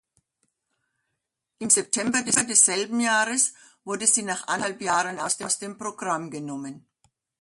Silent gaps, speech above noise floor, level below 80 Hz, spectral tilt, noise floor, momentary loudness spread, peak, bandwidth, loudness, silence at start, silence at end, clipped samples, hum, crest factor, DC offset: none; 57 dB; -70 dBFS; -1.5 dB/octave; -82 dBFS; 15 LU; -4 dBFS; 12 kHz; -22 LUFS; 1.6 s; 0.6 s; under 0.1%; none; 24 dB; under 0.1%